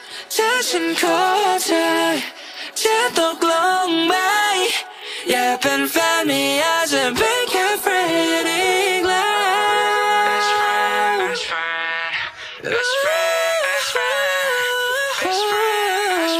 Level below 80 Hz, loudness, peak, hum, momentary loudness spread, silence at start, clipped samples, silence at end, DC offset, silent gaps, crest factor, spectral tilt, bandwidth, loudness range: -60 dBFS; -18 LUFS; -2 dBFS; none; 5 LU; 0 s; under 0.1%; 0 s; under 0.1%; none; 16 dB; -1 dB/octave; 15.5 kHz; 2 LU